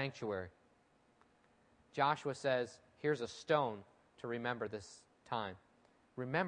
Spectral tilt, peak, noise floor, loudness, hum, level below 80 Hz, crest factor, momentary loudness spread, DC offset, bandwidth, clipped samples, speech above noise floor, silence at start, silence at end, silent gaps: -5.5 dB/octave; -18 dBFS; -72 dBFS; -39 LUFS; none; -80 dBFS; 22 dB; 18 LU; under 0.1%; 10 kHz; under 0.1%; 33 dB; 0 s; 0 s; none